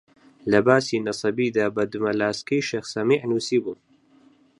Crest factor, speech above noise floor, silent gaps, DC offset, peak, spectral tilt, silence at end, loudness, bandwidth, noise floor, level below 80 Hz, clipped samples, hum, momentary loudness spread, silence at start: 22 dB; 34 dB; none; under 0.1%; -2 dBFS; -5 dB/octave; 0.85 s; -23 LUFS; 11 kHz; -56 dBFS; -62 dBFS; under 0.1%; none; 7 LU; 0.45 s